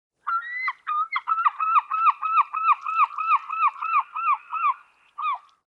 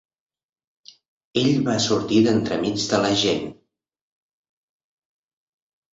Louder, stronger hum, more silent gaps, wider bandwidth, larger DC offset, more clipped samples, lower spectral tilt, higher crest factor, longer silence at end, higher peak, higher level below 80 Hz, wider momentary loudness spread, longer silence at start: about the same, -23 LUFS vs -21 LUFS; neither; neither; second, 5.6 kHz vs 8 kHz; neither; neither; second, 1 dB/octave vs -4.5 dB/octave; about the same, 16 dB vs 18 dB; second, 0.3 s vs 2.4 s; about the same, -8 dBFS vs -6 dBFS; second, -88 dBFS vs -58 dBFS; about the same, 8 LU vs 8 LU; second, 0.25 s vs 1.35 s